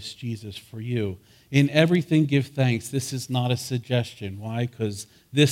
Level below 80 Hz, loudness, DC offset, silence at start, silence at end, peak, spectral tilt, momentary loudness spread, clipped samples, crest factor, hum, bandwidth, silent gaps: -62 dBFS; -25 LUFS; under 0.1%; 0 s; 0 s; -4 dBFS; -6 dB/octave; 14 LU; under 0.1%; 20 dB; none; 16 kHz; none